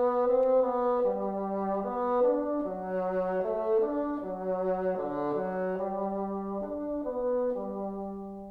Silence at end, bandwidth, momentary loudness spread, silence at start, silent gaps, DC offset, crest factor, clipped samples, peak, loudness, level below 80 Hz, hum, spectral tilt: 0 s; 4.4 kHz; 9 LU; 0 s; none; under 0.1%; 14 dB; under 0.1%; -16 dBFS; -30 LUFS; -58 dBFS; none; -10 dB/octave